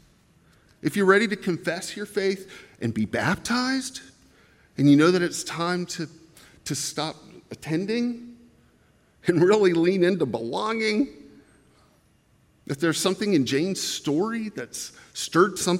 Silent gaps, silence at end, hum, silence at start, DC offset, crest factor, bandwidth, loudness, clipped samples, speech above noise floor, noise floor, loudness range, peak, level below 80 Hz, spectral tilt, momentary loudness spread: none; 0 s; none; 0.85 s; under 0.1%; 22 dB; 16.5 kHz; -24 LUFS; under 0.1%; 38 dB; -61 dBFS; 5 LU; -4 dBFS; -64 dBFS; -4.5 dB/octave; 16 LU